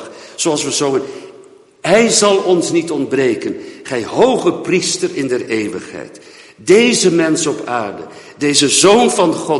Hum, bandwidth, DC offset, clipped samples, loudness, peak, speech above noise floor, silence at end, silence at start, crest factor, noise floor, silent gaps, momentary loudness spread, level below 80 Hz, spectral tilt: none; 11.5 kHz; under 0.1%; under 0.1%; -14 LUFS; 0 dBFS; 28 dB; 0 s; 0 s; 14 dB; -42 dBFS; none; 18 LU; -56 dBFS; -3 dB/octave